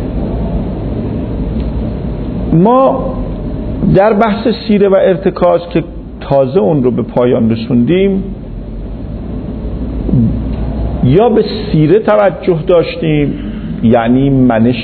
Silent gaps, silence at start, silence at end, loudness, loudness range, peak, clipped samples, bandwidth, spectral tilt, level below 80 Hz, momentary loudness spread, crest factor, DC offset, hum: none; 0 s; 0 s; -12 LUFS; 4 LU; 0 dBFS; under 0.1%; 4.5 kHz; -11.5 dB/octave; -24 dBFS; 12 LU; 12 dB; under 0.1%; none